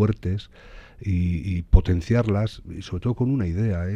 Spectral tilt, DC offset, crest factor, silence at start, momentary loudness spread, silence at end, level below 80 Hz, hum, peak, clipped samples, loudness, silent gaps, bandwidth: -8.5 dB/octave; under 0.1%; 22 dB; 0 s; 12 LU; 0 s; -28 dBFS; none; 0 dBFS; under 0.1%; -24 LUFS; none; 7.8 kHz